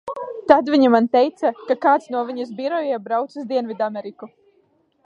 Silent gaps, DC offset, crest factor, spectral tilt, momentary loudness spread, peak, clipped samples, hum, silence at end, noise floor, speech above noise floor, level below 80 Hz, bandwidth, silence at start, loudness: none; under 0.1%; 20 dB; -6 dB/octave; 12 LU; 0 dBFS; under 0.1%; none; 0.8 s; -62 dBFS; 42 dB; -64 dBFS; 8.6 kHz; 0.05 s; -20 LUFS